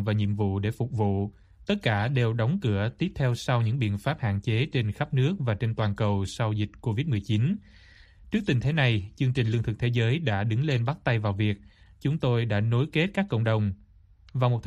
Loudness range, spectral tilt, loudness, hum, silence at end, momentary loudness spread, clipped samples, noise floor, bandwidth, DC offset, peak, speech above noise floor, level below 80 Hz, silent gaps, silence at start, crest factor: 2 LU; -7.5 dB/octave; -27 LUFS; none; 0 s; 5 LU; under 0.1%; -55 dBFS; 11 kHz; under 0.1%; -10 dBFS; 29 dB; -52 dBFS; none; 0 s; 16 dB